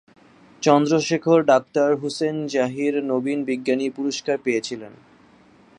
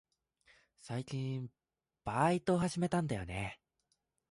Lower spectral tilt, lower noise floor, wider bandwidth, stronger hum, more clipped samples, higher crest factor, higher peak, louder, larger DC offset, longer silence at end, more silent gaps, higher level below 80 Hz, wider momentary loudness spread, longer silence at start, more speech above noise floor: second, -5 dB/octave vs -6.5 dB/octave; second, -52 dBFS vs -82 dBFS; about the same, 10.5 kHz vs 11.5 kHz; neither; neither; about the same, 20 dB vs 20 dB; first, -2 dBFS vs -18 dBFS; first, -21 LUFS vs -36 LUFS; neither; first, 0.9 s vs 0.75 s; neither; second, -70 dBFS vs -60 dBFS; second, 8 LU vs 13 LU; second, 0.6 s vs 0.85 s; second, 32 dB vs 47 dB